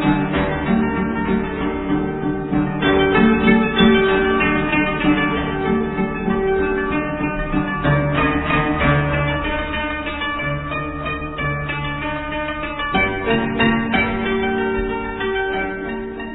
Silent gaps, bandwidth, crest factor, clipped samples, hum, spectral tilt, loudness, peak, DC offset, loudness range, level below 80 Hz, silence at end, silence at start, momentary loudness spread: none; 4.1 kHz; 18 dB; under 0.1%; none; -10 dB/octave; -19 LUFS; 0 dBFS; 0.4%; 6 LU; -32 dBFS; 0 s; 0 s; 9 LU